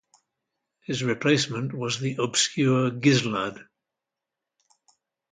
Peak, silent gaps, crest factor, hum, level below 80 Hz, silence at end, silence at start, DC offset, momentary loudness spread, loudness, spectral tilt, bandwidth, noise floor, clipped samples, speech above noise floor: -8 dBFS; none; 20 dB; none; -66 dBFS; 1.7 s; 0.9 s; under 0.1%; 9 LU; -24 LUFS; -4.5 dB/octave; 9.6 kHz; -87 dBFS; under 0.1%; 62 dB